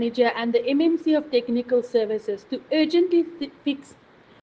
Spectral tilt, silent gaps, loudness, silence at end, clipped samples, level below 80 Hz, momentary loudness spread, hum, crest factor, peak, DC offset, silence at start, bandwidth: -5.5 dB/octave; none; -23 LUFS; 0.6 s; under 0.1%; -70 dBFS; 10 LU; none; 16 dB; -8 dBFS; under 0.1%; 0 s; 7.8 kHz